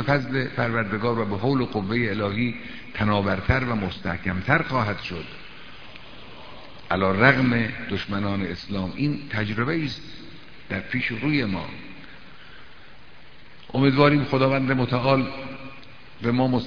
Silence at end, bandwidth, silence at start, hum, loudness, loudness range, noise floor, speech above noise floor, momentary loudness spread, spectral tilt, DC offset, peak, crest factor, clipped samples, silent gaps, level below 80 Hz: 0 s; 5.4 kHz; 0 s; none; -24 LUFS; 5 LU; -49 dBFS; 26 dB; 23 LU; -8 dB/octave; 0.9%; 0 dBFS; 24 dB; under 0.1%; none; -46 dBFS